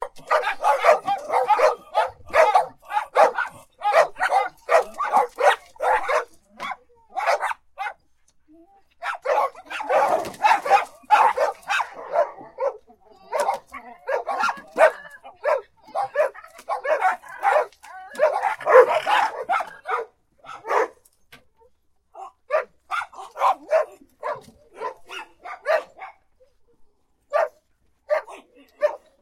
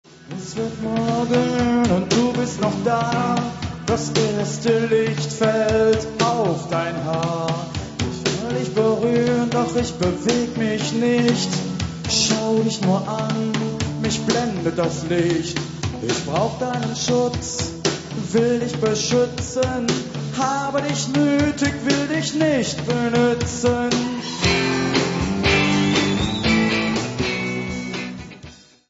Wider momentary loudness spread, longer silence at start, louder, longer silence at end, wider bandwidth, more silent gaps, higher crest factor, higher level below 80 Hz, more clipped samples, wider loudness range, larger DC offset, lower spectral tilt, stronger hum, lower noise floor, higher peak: first, 17 LU vs 8 LU; about the same, 0 s vs 0.1 s; about the same, -22 LUFS vs -21 LUFS; about the same, 0.25 s vs 0.35 s; first, 16 kHz vs 8 kHz; neither; about the same, 22 dB vs 18 dB; second, -62 dBFS vs -40 dBFS; neither; first, 9 LU vs 3 LU; neither; second, -1.5 dB/octave vs -5 dB/octave; neither; first, -64 dBFS vs -43 dBFS; about the same, 0 dBFS vs -2 dBFS